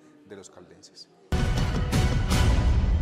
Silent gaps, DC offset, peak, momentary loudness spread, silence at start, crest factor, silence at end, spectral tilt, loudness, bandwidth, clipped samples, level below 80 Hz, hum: none; under 0.1%; -12 dBFS; 23 LU; 0.3 s; 12 dB; 0 s; -5.5 dB/octave; -25 LUFS; 15.5 kHz; under 0.1%; -28 dBFS; none